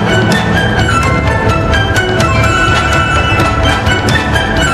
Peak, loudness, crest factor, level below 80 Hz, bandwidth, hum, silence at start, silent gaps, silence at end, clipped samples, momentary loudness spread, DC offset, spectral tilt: 0 dBFS; -10 LUFS; 10 dB; -20 dBFS; 14 kHz; none; 0 s; none; 0 s; under 0.1%; 2 LU; under 0.1%; -5 dB/octave